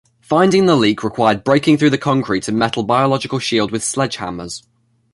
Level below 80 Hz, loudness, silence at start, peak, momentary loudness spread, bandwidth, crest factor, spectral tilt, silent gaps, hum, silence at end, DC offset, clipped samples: -50 dBFS; -16 LUFS; 0.3 s; 0 dBFS; 11 LU; 11.5 kHz; 16 dB; -5 dB/octave; none; none; 0.55 s; under 0.1%; under 0.1%